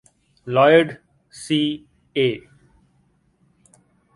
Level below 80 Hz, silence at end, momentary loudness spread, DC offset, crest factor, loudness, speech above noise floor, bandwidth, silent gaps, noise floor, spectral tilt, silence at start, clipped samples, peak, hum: -62 dBFS; 1.75 s; 24 LU; under 0.1%; 20 dB; -19 LUFS; 44 dB; 11.5 kHz; none; -62 dBFS; -5.5 dB/octave; 0.45 s; under 0.1%; -2 dBFS; none